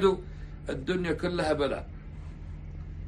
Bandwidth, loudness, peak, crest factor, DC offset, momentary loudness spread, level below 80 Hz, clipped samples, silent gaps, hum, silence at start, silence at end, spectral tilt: 11 kHz; -31 LUFS; -12 dBFS; 20 dB; under 0.1%; 16 LU; -42 dBFS; under 0.1%; none; none; 0 s; 0 s; -6.5 dB/octave